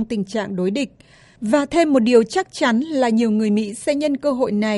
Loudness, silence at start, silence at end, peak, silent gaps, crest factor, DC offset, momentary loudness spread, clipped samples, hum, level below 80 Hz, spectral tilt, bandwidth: -19 LUFS; 0 s; 0 s; -2 dBFS; none; 16 dB; under 0.1%; 8 LU; under 0.1%; none; -54 dBFS; -5.5 dB/octave; 11.5 kHz